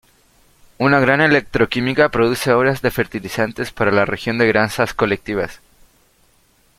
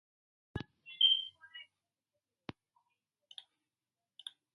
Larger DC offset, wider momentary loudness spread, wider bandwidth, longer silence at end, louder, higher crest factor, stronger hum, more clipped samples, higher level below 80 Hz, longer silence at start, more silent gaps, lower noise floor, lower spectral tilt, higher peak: neither; second, 9 LU vs 26 LU; first, 16 kHz vs 11 kHz; second, 1.2 s vs 2.95 s; first, -17 LUFS vs -28 LUFS; second, 18 dB vs 24 dB; neither; neither; first, -46 dBFS vs -68 dBFS; first, 0.8 s vs 0.55 s; neither; second, -57 dBFS vs under -90 dBFS; first, -5.5 dB/octave vs -3.5 dB/octave; first, 0 dBFS vs -18 dBFS